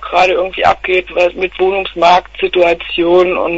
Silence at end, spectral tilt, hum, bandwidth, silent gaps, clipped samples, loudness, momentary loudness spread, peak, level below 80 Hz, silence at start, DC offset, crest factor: 0 s; -5 dB/octave; none; 8 kHz; none; under 0.1%; -12 LUFS; 4 LU; 0 dBFS; -40 dBFS; 0 s; under 0.1%; 12 dB